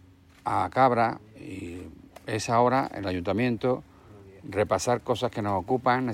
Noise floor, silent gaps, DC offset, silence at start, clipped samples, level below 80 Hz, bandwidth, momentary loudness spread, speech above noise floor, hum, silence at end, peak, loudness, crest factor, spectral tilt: -50 dBFS; none; under 0.1%; 0.45 s; under 0.1%; -58 dBFS; 16 kHz; 18 LU; 24 dB; none; 0 s; -8 dBFS; -26 LUFS; 18 dB; -5.5 dB/octave